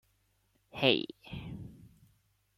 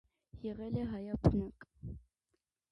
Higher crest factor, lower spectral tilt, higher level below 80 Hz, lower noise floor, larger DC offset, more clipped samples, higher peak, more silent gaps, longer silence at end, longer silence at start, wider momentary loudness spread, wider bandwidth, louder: about the same, 28 dB vs 24 dB; second, -6 dB/octave vs -10 dB/octave; second, -62 dBFS vs -48 dBFS; second, -74 dBFS vs -85 dBFS; neither; neither; first, -10 dBFS vs -14 dBFS; neither; about the same, 0.7 s vs 0.75 s; first, 0.75 s vs 0.35 s; first, 21 LU vs 18 LU; first, 15.5 kHz vs 9.2 kHz; first, -31 LUFS vs -37 LUFS